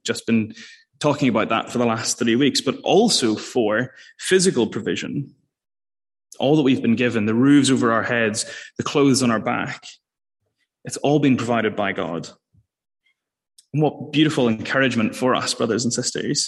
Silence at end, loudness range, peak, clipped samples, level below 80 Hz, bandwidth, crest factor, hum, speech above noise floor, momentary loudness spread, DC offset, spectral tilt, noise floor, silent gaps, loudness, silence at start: 0 s; 5 LU; -4 dBFS; under 0.1%; -64 dBFS; 12.5 kHz; 16 dB; none; over 70 dB; 12 LU; under 0.1%; -4.5 dB/octave; under -90 dBFS; none; -20 LUFS; 0.05 s